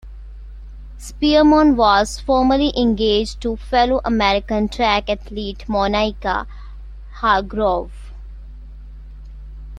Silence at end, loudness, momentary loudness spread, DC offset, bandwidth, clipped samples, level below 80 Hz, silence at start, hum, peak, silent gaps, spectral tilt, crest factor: 0 s; -17 LUFS; 25 LU; under 0.1%; 12 kHz; under 0.1%; -32 dBFS; 0.05 s; none; -2 dBFS; none; -5 dB/octave; 16 dB